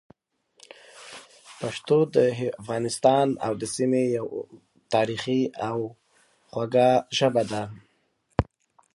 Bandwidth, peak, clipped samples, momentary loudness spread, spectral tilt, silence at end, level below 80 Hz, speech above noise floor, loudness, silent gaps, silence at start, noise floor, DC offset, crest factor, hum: 11.5 kHz; -2 dBFS; under 0.1%; 17 LU; -5.5 dB/octave; 0.55 s; -52 dBFS; 46 dB; -25 LUFS; none; 0.95 s; -69 dBFS; under 0.1%; 24 dB; none